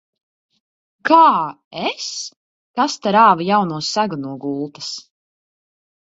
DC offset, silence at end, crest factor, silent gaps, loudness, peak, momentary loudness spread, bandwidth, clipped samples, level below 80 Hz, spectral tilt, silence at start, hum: under 0.1%; 1.1 s; 20 dB; 1.64-1.71 s, 2.36-2.74 s; -17 LUFS; 0 dBFS; 17 LU; 8 kHz; under 0.1%; -68 dBFS; -4 dB/octave; 1.05 s; none